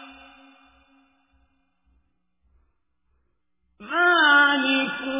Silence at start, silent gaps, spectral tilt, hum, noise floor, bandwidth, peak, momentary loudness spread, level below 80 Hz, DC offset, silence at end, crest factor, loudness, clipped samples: 0 s; none; -5.5 dB/octave; none; -74 dBFS; 3.9 kHz; -6 dBFS; 8 LU; -68 dBFS; under 0.1%; 0 s; 20 dB; -18 LUFS; under 0.1%